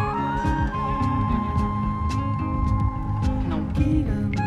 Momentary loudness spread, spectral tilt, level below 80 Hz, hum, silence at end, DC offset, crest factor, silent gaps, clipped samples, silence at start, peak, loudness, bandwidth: 3 LU; -8 dB/octave; -30 dBFS; none; 0 s; 0.1%; 14 dB; none; under 0.1%; 0 s; -10 dBFS; -24 LUFS; 10 kHz